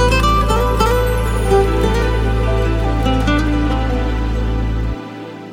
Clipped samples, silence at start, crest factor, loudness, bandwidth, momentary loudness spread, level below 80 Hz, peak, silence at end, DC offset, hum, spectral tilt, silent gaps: under 0.1%; 0 s; 14 dB; -17 LUFS; 16.5 kHz; 7 LU; -18 dBFS; -2 dBFS; 0 s; under 0.1%; none; -6 dB/octave; none